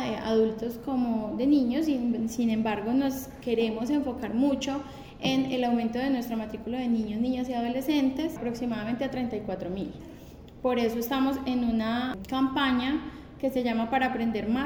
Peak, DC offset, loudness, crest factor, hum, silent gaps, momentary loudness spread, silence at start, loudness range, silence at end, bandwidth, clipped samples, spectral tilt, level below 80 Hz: -12 dBFS; under 0.1%; -28 LUFS; 16 dB; none; none; 8 LU; 0 s; 3 LU; 0 s; over 20 kHz; under 0.1%; -5.5 dB/octave; -52 dBFS